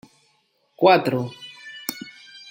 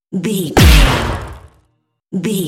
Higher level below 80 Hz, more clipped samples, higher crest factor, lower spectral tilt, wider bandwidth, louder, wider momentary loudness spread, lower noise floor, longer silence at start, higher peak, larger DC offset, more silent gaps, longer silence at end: second, -70 dBFS vs -18 dBFS; second, under 0.1% vs 0.2%; first, 22 dB vs 14 dB; about the same, -5 dB/octave vs -5 dB/octave; about the same, 16.5 kHz vs 17 kHz; second, -21 LUFS vs -13 LUFS; first, 22 LU vs 17 LU; about the same, -66 dBFS vs -63 dBFS; first, 0.8 s vs 0.1 s; about the same, -2 dBFS vs 0 dBFS; neither; neither; first, 0.4 s vs 0 s